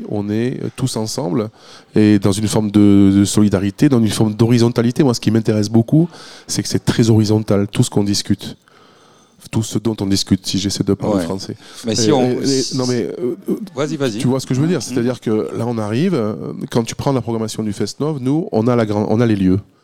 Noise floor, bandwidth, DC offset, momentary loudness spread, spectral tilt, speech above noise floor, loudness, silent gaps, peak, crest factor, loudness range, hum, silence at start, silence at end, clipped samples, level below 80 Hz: -49 dBFS; 16 kHz; 0.5%; 9 LU; -6 dB/octave; 33 dB; -17 LUFS; none; 0 dBFS; 16 dB; 6 LU; none; 0 s; 0.2 s; under 0.1%; -50 dBFS